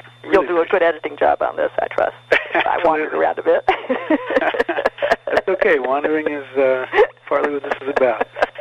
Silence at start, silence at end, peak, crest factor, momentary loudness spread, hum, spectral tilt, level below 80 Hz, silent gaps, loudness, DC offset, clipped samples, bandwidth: 0.05 s; 0 s; -2 dBFS; 16 dB; 5 LU; none; -5 dB/octave; -52 dBFS; none; -18 LUFS; under 0.1%; under 0.1%; 9 kHz